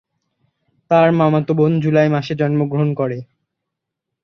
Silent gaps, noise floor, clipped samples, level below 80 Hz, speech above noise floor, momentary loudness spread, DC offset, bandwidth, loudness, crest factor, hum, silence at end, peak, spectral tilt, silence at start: none; -80 dBFS; under 0.1%; -60 dBFS; 65 dB; 7 LU; under 0.1%; 6.4 kHz; -16 LUFS; 16 dB; none; 1 s; -2 dBFS; -9 dB/octave; 0.9 s